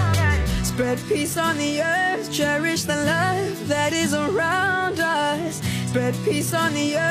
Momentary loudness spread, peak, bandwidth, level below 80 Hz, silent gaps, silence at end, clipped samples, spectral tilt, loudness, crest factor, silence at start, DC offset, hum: 4 LU; -8 dBFS; 15 kHz; -36 dBFS; none; 0 s; under 0.1%; -4.5 dB/octave; -22 LUFS; 14 dB; 0 s; under 0.1%; none